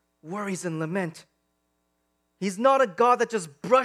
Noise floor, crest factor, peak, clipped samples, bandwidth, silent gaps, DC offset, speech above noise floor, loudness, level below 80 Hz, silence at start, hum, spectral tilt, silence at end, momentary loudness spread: -74 dBFS; 20 dB; -6 dBFS; under 0.1%; 13.5 kHz; none; under 0.1%; 50 dB; -25 LUFS; -80 dBFS; 0.25 s; none; -5 dB/octave; 0 s; 12 LU